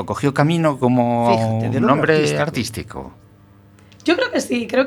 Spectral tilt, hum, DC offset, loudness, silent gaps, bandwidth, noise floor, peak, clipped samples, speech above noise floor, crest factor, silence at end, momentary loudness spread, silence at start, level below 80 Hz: -6 dB/octave; none; under 0.1%; -18 LUFS; none; 19 kHz; -48 dBFS; 0 dBFS; under 0.1%; 30 dB; 18 dB; 0 s; 11 LU; 0 s; -50 dBFS